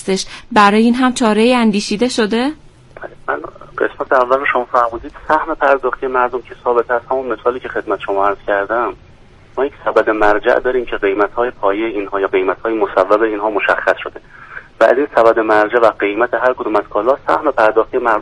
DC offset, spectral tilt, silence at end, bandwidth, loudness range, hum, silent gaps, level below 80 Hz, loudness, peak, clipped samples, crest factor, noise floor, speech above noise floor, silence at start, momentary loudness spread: under 0.1%; -4.5 dB/octave; 0 s; 11.5 kHz; 4 LU; none; none; -42 dBFS; -15 LUFS; 0 dBFS; under 0.1%; 14 dB; -42 dBFS; 27 dB; 0 s; 10 LU